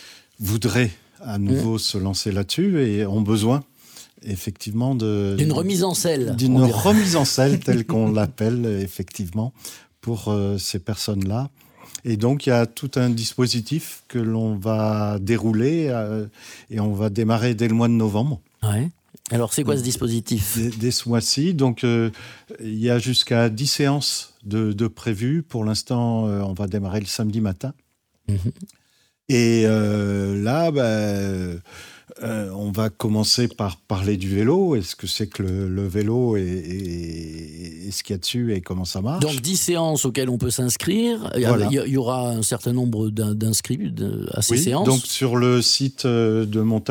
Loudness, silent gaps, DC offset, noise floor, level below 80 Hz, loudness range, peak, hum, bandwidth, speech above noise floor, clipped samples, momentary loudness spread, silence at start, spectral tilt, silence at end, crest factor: -22 LUFS; none; under 0.1%; -63 dBFS; -52 dBFS; 5 LU; -4 dBFS; none; 20 kHz; 42 dB; under 0.1%; 11 LU; 0 s; -5 dB/octave; 0 s; 18 dB